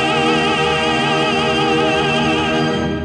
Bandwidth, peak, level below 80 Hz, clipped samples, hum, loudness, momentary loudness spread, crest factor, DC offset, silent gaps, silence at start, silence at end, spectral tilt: 10 kHz; -6 dBFS; -40 dBFS; under 0.1%; none; -15 LUFS; 2 LU; 10 dB; under 0.1%; none; 0 s; 0 s; -4.5 dB/octave